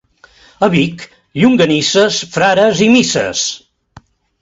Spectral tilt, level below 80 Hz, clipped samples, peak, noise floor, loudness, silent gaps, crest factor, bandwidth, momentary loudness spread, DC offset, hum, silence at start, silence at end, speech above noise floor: -4 dB/octave; -48 dBFS; under 0.1%; 0 dBFS; -46 dBFS; -12 LUFS; none; 14 dB; 8 kHz; 9 LU; under 0.1%; none; 0.6 s; 0.85 s; 34 dB